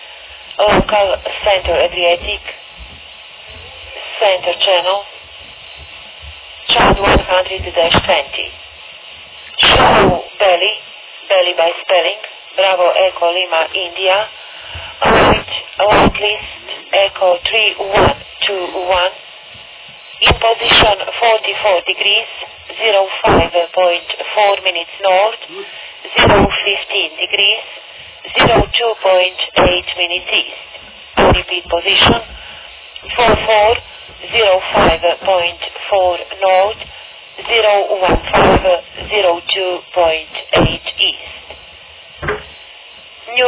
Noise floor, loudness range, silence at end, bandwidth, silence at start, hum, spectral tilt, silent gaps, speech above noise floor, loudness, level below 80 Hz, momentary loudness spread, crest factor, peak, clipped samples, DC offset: -37 dBFS; 4 LU; 0 s; 4 kHz; 0 s; none; -8 dB/octave; none; 24 dB; -13 LUFS; -32 dBFS; 21 LU; 14 dB; 0 dBFS; under 0.1%; under 0.1%